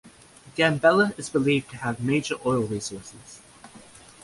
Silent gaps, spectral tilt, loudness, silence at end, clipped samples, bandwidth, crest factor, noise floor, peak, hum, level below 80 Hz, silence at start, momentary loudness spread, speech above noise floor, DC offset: none; -5 dB/octave; -24 LUFS; 0.45 s; under 0.1%; 11.5 kHz; 20 dB; -50 dBFS; -6 dBFS; none; -58 dBFS; 0.05 s; 21 LU; 26 dB; under 0.1%